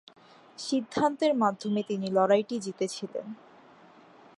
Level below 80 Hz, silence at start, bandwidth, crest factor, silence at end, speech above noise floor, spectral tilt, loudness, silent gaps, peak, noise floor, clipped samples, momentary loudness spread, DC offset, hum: -74 dBFS; 0.6 s; 11.5 kHz; 18 dB; 1.05 s; 27 dB; -5 dB/octave; -28 LUFS; none; -10 dBFS; -55 dBFS; under 0.1%; 15 LU; under 0.1%; none